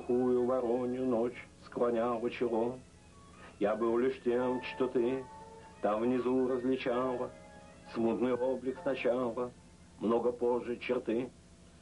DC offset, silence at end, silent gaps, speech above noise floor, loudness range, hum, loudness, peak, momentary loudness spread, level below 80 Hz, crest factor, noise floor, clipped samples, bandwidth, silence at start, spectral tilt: under 0.1%; 0.3 s; none; 23 dB; 2 LU; 60 Hz at -55 dBFS; -33 LUFS; -18 dBFS; 14 LU; -64 dBFS; 14 dB; -56 dBFS; under 0.1%; 11 kHz; 0 s; -7 dB/octave